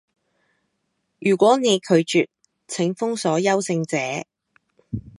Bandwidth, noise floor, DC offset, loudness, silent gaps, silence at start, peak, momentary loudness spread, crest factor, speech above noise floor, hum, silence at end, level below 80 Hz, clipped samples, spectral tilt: 11.5 kHz; -74 dBFS; under 0.1%; -21 LUFS; none; 1.2 s; -4 dBFS; 14 LU; 20 dB; 54 dB; none; 0.1 s; -58 dBFS; under 0.1%; -4.5 dB/octave